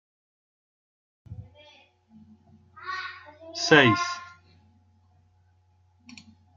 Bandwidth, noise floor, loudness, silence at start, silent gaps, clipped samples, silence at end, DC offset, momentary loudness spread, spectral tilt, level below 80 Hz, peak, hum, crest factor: 7.6 kHz; -63 dBFS; -23 LUFS; 1.3 s; none; under 0.1%; 2.3 s; under 0.1%; 28 LU; -4 dB/octave; -68 dBFS; -2 dBFS; none; 28 dB